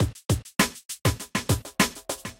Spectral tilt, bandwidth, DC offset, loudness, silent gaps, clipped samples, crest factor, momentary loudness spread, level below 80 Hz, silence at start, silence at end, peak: -4 dB/octave; 17 kHz; under 0.1%; -26 LUFS; 0.85-0.89 s; under 0.1%; 22 dB; 5 LU; -40 dBFS; 0 s; 0.05 s; -6 dBFS